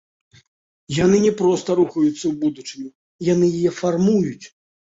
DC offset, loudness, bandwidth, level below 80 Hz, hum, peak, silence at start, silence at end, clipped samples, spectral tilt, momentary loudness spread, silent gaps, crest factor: under 0.1%; -19 LUFS; 8 kHz; -54 dBFS; none; -4 dBFS; 0.9 s; 0.45 s; under 0.1%; -6.5 dB/octave; 16 LU; 2.95-3.19 s; 16 dB